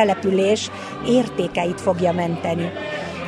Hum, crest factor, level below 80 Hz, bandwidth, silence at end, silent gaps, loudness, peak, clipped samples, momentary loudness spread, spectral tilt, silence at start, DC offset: none; 16 dB; -52 dBFS; 12 kHz; 0 s; none; -21 LUFS; -4 dBFS; under 0.1%; 9 LU; -5.5 dB/octave; 0 s; under 0.1%